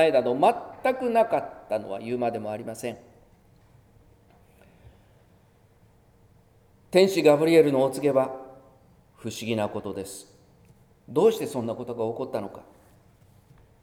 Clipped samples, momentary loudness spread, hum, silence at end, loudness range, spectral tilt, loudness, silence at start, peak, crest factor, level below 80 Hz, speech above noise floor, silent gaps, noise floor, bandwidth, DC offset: under 0.1%; 17 LU; none; 1.2 s; 12 LU; -5.5 dB/octave; -25 LUFS; 0 s; -4 dBFS; 22 dB; -64 dBFS; 35 dB; none; -59 dBFS; 17 kHz; under 0.1%